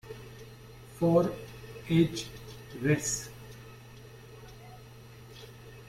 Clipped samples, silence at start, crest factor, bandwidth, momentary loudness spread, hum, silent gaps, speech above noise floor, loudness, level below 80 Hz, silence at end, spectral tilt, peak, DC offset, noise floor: under 0.1%; 0.05 s; 22 dB; 16 kHz; 23 LU; none; none; 23 dB; -29 LUFS; -56 dBFS; 0 s; -5.5 dB/octave; -12 dBFS; under 0.1%; -50 dBFS